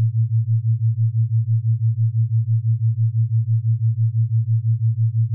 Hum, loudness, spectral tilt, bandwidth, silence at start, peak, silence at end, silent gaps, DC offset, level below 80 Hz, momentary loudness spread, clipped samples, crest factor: none; -20 LUFS; -29.5 dB/octave; 0.2 kHz; 0 s; -12 dBFS; 0 s; none; under 0.1%; -64 dBFS; 1 LU; under 0.1%; 6 dB